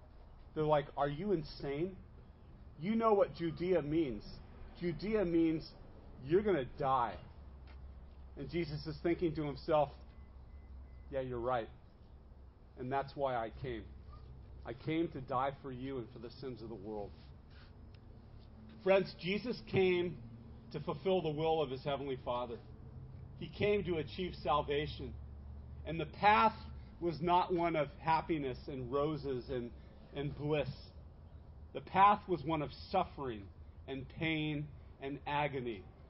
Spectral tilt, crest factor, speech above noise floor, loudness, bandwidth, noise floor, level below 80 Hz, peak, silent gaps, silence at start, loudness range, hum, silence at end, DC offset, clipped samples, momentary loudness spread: -5 dB/octave; 22 dB; 21 dB; -36 LUFS; 5.6 kHz; -57 dBFS; -54 dBFS; -16 dBFS; none; 0 s; 7 LU; none; 0 s; under 0.1%; under 0.1%; 23 LU